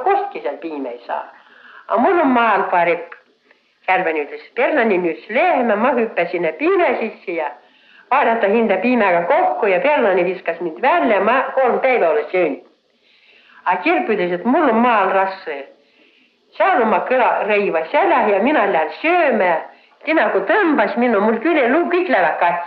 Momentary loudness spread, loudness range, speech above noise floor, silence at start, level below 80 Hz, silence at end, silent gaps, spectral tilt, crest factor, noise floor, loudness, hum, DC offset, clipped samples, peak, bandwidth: 10 LU; 3 LU; 40 dB; 0 s; -66 dBFS; 0 s; none; -8 dB/octave; 14 dB; -57 dBFS; -16 LUFS; none; under 0.1%; under 0.1%; -2 dBFS; 5.6 kHz